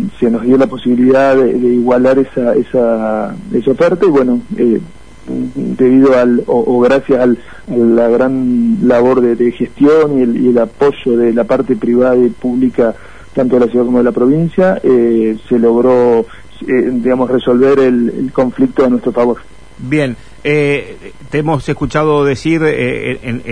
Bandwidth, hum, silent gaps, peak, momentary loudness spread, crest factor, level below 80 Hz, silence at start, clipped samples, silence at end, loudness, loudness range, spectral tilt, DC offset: 10 kHz; none; none; 0 dBFS; 9 LU; 10 dB; -40 dBFS; 0 s; under 0.1%; 0 s; -12 LUFS; 3 LU; -8 dB/octave; 2%